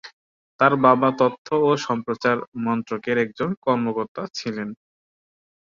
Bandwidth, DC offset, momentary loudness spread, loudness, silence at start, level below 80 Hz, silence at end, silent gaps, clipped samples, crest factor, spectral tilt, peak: 7.4 kHz; under 0.1%; 13 LU; -22 LUFS; 0.05 s; -66 dBFS; 1.05 s; 0.13-0.59 s, 1.38-1.45 s, 2.48-2.52 s, 3.57-3.62 s, 4.08-4.15 s; under 0.1%; 22 dB; -6 dB/octave; -2 dBFS